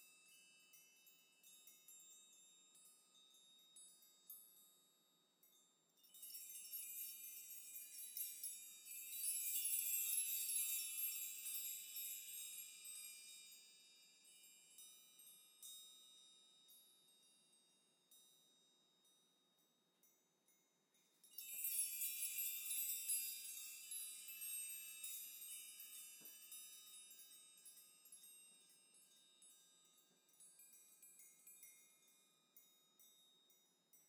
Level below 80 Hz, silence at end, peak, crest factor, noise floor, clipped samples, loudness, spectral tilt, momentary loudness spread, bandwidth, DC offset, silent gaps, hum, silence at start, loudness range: under -90 dBFS; 0.05 s; -30 dBFS; 24 dB; -82 dBFS; under 0.1%; -46 LUFS; 4 dB/octave; 26 LU; 17 kHz; under 0.1%; none; none; 0 s; 23 LU